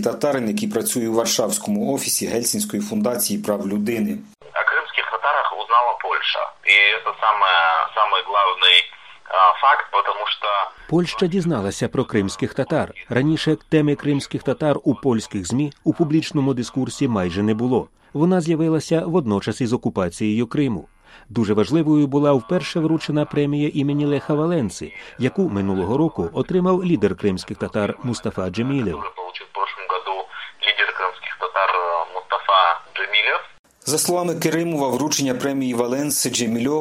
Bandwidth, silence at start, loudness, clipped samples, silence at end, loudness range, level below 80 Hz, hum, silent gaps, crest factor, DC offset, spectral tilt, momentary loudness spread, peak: 16 kHz; 0 s; -20 LUFS; under 0.1%; 0 s; 6 LU; -54 dBFS; none; 33.59-33.64 s; 20 dB; under 0.1%; -4 dB/octave; 9 LU; -2 dBFS